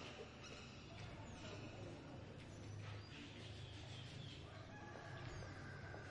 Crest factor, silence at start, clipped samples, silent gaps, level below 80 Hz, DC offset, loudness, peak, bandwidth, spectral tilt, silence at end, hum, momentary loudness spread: 14 dB; 0 s; under 0.1%; none; -68 dBFS; under 0.1%; -54 LUFS; -40 dBFS; 11 kHz; -5 dB/octave; 0 s; none; 3 LU